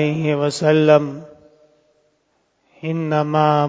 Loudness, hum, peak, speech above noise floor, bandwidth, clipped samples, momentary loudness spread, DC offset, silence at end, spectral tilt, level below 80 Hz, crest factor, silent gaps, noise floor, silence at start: -17 LUFS; none; 0 dBFS; 49 dB; 8 kHz; under 0.1%; 16 LU; under 0.1%; 0 s; -6.5 dB/octave; -66 dBFS; 18 dB; none; -65 dBFS; 0 s